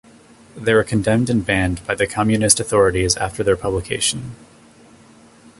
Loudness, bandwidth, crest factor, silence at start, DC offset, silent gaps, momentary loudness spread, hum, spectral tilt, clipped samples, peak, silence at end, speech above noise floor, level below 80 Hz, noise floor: -18 LUFS; 12 kHz; 20 dB; 0.55 s; under 0.1%; none; 7 LU; none; -4 dB/octave; under 0.1%; 0 dBFS; 1.25 s; 29 dB; -38 dBFS; -47 dBFS